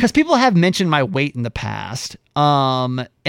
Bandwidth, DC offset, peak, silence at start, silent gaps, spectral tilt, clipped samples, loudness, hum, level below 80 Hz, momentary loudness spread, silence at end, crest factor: 15.5 kHz; under 0.1%; -2 dBFS; 0 s; none; -5.5 dB/octave; under 0.1%; -17 LUFS; none; -46 dBFS; 12 LU; 0 s; 14 dB